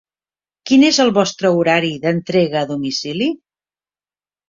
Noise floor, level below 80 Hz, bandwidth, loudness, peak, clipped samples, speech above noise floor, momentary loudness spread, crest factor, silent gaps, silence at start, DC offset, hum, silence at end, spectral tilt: under -90 dBFS; -60 dBFS; 7.6 kHz; -16 LUFS; -2 dBFS; under 0.1%; over 75 dB; 9 LU; 16 dB; none; 0.65 s; under 0.1%; 50 Hz at -45 dBFS; 1.15 s; -4.5 dB/octave